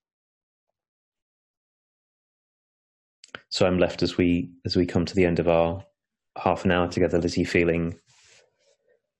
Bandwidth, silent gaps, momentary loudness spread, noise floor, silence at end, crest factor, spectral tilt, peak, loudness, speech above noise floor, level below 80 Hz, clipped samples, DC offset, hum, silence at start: 10.5 kHz; none; 10 LU; -67 dBFS; 1.25 s; 20 dB; -6 dB/octave; -8 dBFS; -24 LUFS; 44 dB; -54 dBFS; under 0.1%; under 0.1%; none; 3.5 s